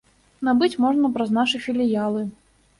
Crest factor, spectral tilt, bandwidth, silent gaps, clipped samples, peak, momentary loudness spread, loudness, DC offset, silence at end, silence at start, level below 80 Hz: 14 dB; -5.5 dB/octave; 11.5 kHz; none; under 0.1%; -8 dBFS; 8 LU; -22 LUFS; under 0.1%; 0.5 s; 0.4 s; -60 dBFS